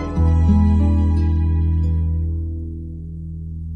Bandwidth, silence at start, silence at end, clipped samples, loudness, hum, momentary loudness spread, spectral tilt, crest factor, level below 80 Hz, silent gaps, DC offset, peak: 4.2 kHz; 0 s; 0 s; under 0.1%; -18 LUFS; none; 16 LU; -10 dB/octave; 12 dB; -22 dBFS; none; under 0.1%; -6 dBFS